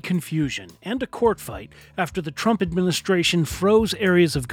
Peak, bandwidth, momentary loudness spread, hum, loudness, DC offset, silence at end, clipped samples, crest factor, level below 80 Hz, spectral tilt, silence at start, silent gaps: -4 dBFS; 17 kHz; 12 LU; none; -22 LUFS; under 0.1%; 0 s; under 0.1%; 18 dB; -44 dBFS; -5 dB/octave; 0.05 s; none